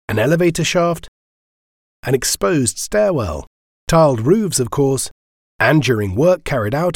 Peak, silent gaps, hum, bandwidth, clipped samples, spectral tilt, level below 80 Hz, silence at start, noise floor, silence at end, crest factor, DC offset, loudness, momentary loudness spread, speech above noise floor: -2 dBFS; 1.08-2.03 s, 3.47-3.87 s, 5.11-5.59 s; none; 17.5 kHz; under 0.1%; -5 dB/octave; -40 dBFS; 0.1 s; under -90 dBFS; 0 s; 16 dB; under 0.1%; -16 LUFS; 10 LU; over 74 dB